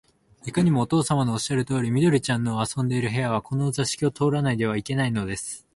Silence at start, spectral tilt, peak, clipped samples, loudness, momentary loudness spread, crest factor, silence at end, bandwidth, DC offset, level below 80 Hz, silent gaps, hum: 0.45 s; -5.5 dB/octave; -8 dBFS; under 0.1%; -24 LUFS; 5 LU; 16 dB; 0.15 s; 11.5 kHz; under 0.1%; -54 dBFS; none; none